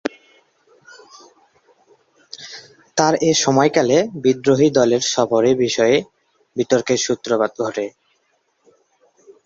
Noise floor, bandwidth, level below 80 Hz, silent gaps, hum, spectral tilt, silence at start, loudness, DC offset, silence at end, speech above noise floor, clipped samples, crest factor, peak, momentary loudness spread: -65 dBFS; 8 kHz; -60 dBFS; none; none; -4 dB/octave; 0.05 s; -17 LUFS; under 0.1%; 1.55 s; 49 dB; under 0.1%; 18 dB; -2 dBFS; 17 LU